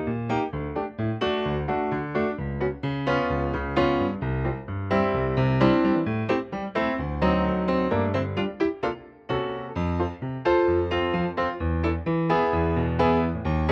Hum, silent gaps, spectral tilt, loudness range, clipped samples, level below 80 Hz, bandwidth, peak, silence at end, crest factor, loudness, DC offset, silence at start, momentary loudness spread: none; none; -8.5 dB/octave; 3 LU; under 0.1%; -38 dBFS; 7.2 kHz; -6 dBFS; 0 s; 18 dB; -25 LUFS; under 0.1%; 0 s; 7 LU